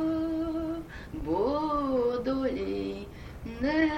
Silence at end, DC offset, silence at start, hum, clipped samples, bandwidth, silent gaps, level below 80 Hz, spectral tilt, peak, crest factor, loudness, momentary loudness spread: 0 s; under 0.1%; 0 s; none; under 0.1%; 9 kHz; none; -46 dBFS; -7 dB/octave; -14 dBFS; 14 dB; -30 LUFS; 13 LU